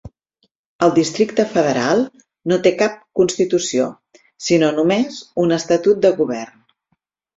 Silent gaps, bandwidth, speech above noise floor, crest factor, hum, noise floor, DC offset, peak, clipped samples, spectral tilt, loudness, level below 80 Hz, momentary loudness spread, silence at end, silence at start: 0.55-0.79 s; 8.2 kHz; 53 dB; 16 dB; none; -70 dBFS; under 0.1%; -2 dBFS; under 0.1%; -5 dB/octave; -17 LUFS; -56 dBFS; 8 LU; 0.9 s; 0.05 s